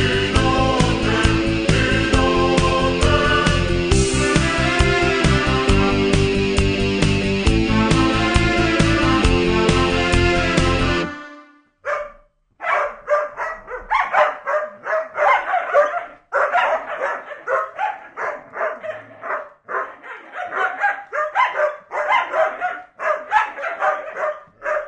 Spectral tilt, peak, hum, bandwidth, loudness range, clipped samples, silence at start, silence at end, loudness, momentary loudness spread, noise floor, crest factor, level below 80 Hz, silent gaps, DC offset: -5 dB/octave; -2 dBFS; none; 10 kHz; 7 LU; under 0.1%; 0 s; 0 s; -19 LUFS; 11 LU; -51 dBFS; 18 dB; -28 dBFS; none; under 0.1%